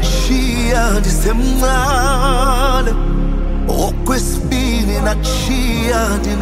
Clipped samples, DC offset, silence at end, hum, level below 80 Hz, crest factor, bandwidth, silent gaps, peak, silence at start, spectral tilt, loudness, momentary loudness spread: under 0.1%; under 0.1%; 0 s; none; -16 dBFS; 12 dB; 16 kHz; none; 0 dBFS; 0 s; -4.5 dB/octave; -16 LUFS; 4 LU